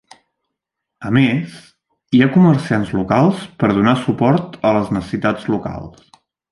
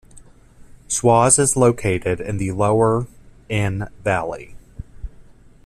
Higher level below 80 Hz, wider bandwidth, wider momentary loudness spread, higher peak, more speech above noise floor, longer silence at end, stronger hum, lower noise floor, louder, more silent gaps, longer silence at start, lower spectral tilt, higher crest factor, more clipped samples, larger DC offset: about the same, -46 dBFS vs -42 dBFS; second, 11.5 kHz vs 14 kHz; second, 11 LU vs 25 LU; about the same, 0 dBFS vs 0 dBFS; first, 64 dB vs 27 dB; first, 0.6 s vs 0.45 s; neither; first, -79 dBFS vs -45 dBFS; about the same, -16 LUFS vs -18 LUFS; neither; first, 1 s vs 0.15 s; first, -8 dB/octave vs -5 dB/octave; about the same, 16 dB vs 20 dB; neither; neither